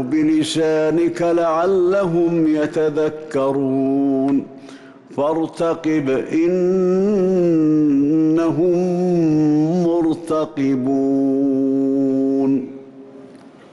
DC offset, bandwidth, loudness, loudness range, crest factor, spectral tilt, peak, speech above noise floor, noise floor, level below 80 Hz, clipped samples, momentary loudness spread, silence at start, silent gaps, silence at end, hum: under 0.1%; 11.5 kHz; -18 LUFS; 3 LU; 8 dB; -7.5 dB/octave; -10 dBFS; 25 dB; -42 dBFS; -56 dBFS; under 0.1%; 5 LU; 0 s; none; 0.35 s; none